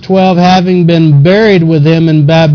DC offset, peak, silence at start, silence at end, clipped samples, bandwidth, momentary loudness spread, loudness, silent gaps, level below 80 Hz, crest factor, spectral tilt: under 0.1%; 0 dBFS; 0 s; 0 s; 1%; 5.4 kHz; 2 LU; -6 LUFS; none; -40 dBFS; 6 dB; -8 dB/octave